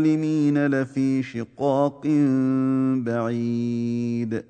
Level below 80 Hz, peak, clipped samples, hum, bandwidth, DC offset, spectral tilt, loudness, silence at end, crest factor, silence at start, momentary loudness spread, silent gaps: -66 dBFS; -8 dBFS; under 0.1%; none; 8.8 kHz; under 0.1%; -8.5 dB/octave; -23 LUFS; 0.05 s; 14 dB; 0 s; 5 LU; none